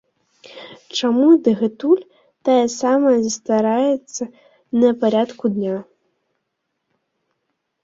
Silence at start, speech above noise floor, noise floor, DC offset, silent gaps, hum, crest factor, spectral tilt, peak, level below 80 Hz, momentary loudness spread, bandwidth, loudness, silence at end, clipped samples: 0.55 s; 59 dB; -75 dBFS; under 0.1%; none; none; 16 dB; -5 dB/octave; -4 dBFS; -66 dBFS; 15 LU; 7.8 kHz; -18 LUFS; 2 s; under 0.1%